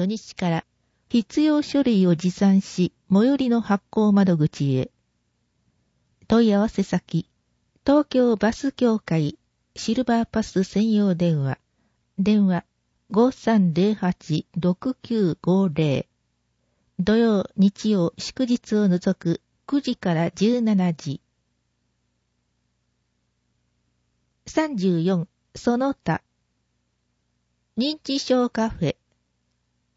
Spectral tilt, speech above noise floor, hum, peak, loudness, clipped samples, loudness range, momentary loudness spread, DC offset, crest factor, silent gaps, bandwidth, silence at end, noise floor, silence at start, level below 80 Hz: -7 dB/octave; 51 dB; 60 Hz at -50 dBFS; -6 dBFS; -22 LUFS; under 0.1%; 6 LU; 9 LU; under 0.1%; 16 dB; none; 8 kHz; 1.05 s; -72 dBFS; 0 s; -54 dBFS